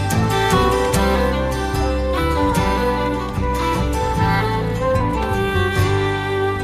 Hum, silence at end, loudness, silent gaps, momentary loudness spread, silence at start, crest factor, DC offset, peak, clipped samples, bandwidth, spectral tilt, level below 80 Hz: none; 0 s; -19 LUFS; none; 4 LU; 0 s; 14 dB; under 0.1%; -4 dBFS; under 0.1%; 15.5 kHz; -5.5 dB/octave; -26 dBFS